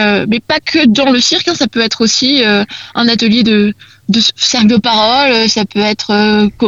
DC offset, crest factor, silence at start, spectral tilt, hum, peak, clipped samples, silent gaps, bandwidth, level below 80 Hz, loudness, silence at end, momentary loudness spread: 0.1%; 10 dB; 0 s; -3.5 dB/octave; none; 0 dBFS; under 0.1%; none; 7.8 kHz; -44 dBFS; -10 LUFS; 0 s; 5 LU